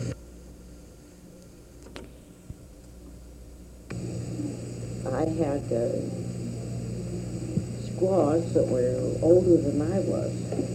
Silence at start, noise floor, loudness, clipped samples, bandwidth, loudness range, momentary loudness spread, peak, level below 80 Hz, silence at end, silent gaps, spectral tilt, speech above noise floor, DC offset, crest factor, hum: 0 s; -48 dBFS; -27 LUFS; under 0.1%; 14 kHz; 22 LU; 25 LU; -6 dBFS; -48 dBFS; 0 s; none; -8 dB/octave; 24 dB; under 0.1%; 22 dB; none